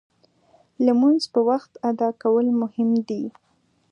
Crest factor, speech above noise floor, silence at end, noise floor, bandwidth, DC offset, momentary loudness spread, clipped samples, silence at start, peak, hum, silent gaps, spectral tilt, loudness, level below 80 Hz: 16 dB; 39 dB; 0.6 s; -59 dBFS; 9.8 kHz; under 0.1%; 9 LU; under 0.1%; 0.8 s; -6 dBFS; none; none; -6.5 dB/octave; -21 LUFS; -76 dBFS